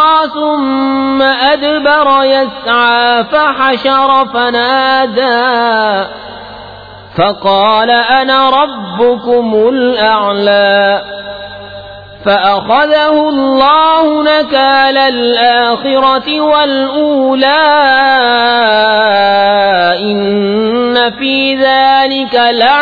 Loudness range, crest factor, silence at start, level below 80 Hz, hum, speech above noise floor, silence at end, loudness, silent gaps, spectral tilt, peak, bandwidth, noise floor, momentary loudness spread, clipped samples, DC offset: 3 LU; 10 dB; 0 s; -46 dBFS; none; 21 dB; 0 s; -9 LUFS; none; -6.5 dB/octave; 0 dBFS; 5 kHz; -30 dBFS; 6 LU; under 0.1%; under 0.1%